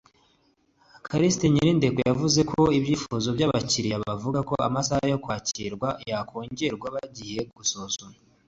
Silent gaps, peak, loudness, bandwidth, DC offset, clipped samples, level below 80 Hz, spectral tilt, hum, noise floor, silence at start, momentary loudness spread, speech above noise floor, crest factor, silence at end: none; -8 dBFS; -25 LUFS; 8 kHz; under 0.1%; under 0.1%; -52 dBFS; -5 dB/octave; none; -66 dBFS; 1.05 s; 12 LU; 41 dB; 18 dB; 0.35 s